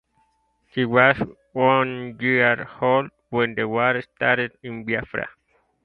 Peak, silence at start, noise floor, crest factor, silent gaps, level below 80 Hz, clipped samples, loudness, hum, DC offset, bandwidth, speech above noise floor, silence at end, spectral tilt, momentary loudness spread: 0 dBFS; 0.75 s; -66 dBFS; 22 dB; none; -56 dBFS; under 0.1%; -21 LUFS; none; under 0.1%; 4.9 kHz; 45 dB; 0.55 s; -8.5 dB/octave; 12 LU